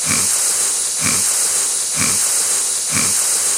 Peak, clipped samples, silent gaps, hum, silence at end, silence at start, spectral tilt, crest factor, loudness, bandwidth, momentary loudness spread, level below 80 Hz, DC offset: -4 dBFS; under 0.1%; none; none; 0 s; 0 s; 0 dB/octave; 14 dB; -14 LUFS; 16.5 kHz; 2 LU; -52 dBFS; under 0.1%